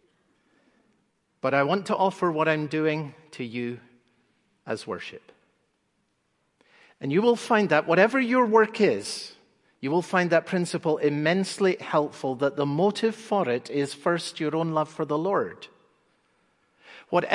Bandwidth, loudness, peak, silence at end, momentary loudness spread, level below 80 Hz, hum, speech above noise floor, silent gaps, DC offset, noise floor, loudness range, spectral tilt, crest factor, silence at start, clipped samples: 11.5 kHz; -25 LUFS; -4 dBFS; 0 s; 14 LU; -76 dBFS; none; 48 dB; none; under 0.1%; -73 dBFS; 11 LU; -5.5 dB/octave; 24 dB; 1.45 s; under 0.1%